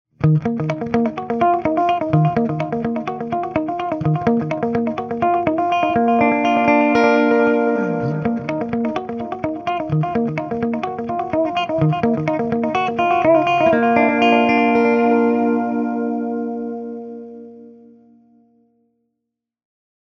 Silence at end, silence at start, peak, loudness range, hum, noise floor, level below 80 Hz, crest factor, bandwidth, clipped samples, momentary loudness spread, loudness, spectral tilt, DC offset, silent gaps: 2.3 s; 0.2 s; 0 dBFS; 7 LU; none; -80 dBFS; -52 dBFS; 18 dB; 6.8 kHz; under 0.1%; 10 LU; -18 LUFS; -8 dB/octave; under 0.1%; none